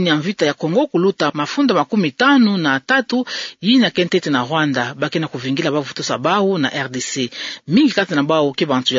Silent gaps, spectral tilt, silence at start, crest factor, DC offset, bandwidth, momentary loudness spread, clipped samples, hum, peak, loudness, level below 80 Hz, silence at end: none; -5 dB/octave; 0 s; 16 dB; under 0.1%; 7.8 kHz; 8 LU; under 0.1%; none; -2 dBFS; -17 LUFS; -64 dBFS; 0 s